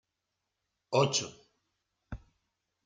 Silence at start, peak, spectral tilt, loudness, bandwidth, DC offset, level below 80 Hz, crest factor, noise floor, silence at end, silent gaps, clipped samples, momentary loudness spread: 0.9 s; -14 dBFS; -3.5 dB/octave; -30 LUFS; 9.6 kHz; under 0.1%; -58 dBFS; 24 dB; -85 dBFS; 0.7 s; none; under 0.1%; 21 LU